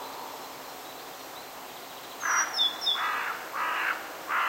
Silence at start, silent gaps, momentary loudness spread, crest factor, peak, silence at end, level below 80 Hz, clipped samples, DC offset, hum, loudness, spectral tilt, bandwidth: 0 s; none; 16 LU; 18 dB; -14 dBFS; 0 s; -74 dBFS; under 0.1%; under 0.1%; none; -28 LUFS; 1 dB/octave; 16 kHz